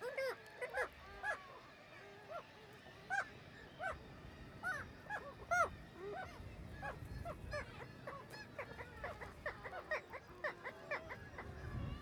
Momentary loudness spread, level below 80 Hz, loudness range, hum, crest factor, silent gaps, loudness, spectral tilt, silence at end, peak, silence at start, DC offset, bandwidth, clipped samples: 14 LU; -60 dBFS; 5 LU; none; 24 dB; none; -46 LUFS; -4.5 dB/octave; 0 s; -24 dBFS; 0 s; under 0.1%; over 20 kHz; under 0.1%